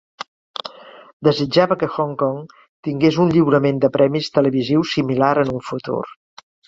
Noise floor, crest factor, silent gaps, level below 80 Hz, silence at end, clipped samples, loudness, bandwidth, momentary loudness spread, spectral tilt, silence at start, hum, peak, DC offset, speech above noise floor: -38 dBFS; 18 dB; 1.13-1.20 s, 2.69-2.83 s; -56 dBFS; 0.6 s; under 0.1%; -18 LUFS; 7.8 kHz; 15 LU; -7 dB/octave; 0.65 s; none; -2 dBFS; under 0.1%; 20 dB